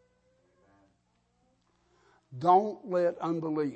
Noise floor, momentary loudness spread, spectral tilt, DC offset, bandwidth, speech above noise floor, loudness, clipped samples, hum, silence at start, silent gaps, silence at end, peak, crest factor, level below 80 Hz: -73 dBFS; 8 LU; -8 dB/octave; under 0.1%; 8.4 kHz; 45 dB; -28 LUFS; under 0.1%; 60 Hz at -65 dBFS; 2.3 s; none; 0 s; -12 dBFS; 20 dB; -78 dBFS